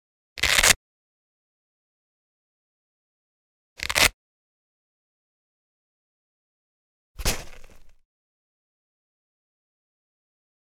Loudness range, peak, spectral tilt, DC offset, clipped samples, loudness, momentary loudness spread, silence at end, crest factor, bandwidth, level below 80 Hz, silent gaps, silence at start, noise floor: 12 LU; 0 dBFS; -0.5 dB/octave; under 0.1%; under 0.1%; -21 LUFS; 17 LU; 2.8 s; 30 dB; 17.5 kHz; -44 dBFS; 0.76-3.76 s, 4.14-7.15 s; 0.35 s; -44 dBFS